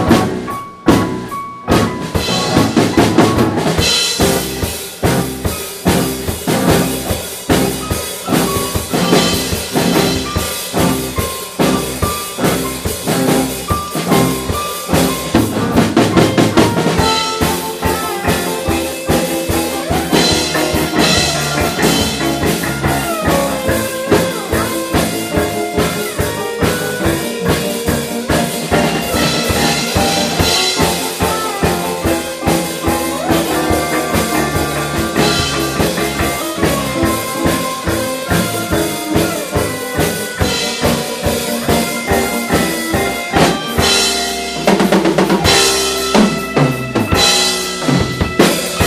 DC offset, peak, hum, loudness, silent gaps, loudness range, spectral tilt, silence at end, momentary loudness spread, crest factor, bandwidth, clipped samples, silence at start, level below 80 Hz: under 0.1%; 0 dBFS; none; -14 LUFS; none; 4 LU; -4 dB/octave; 0 s; 6 LU; 14 dB; 15.5 kHz; under 0.1%; 0 s; -32 dBFS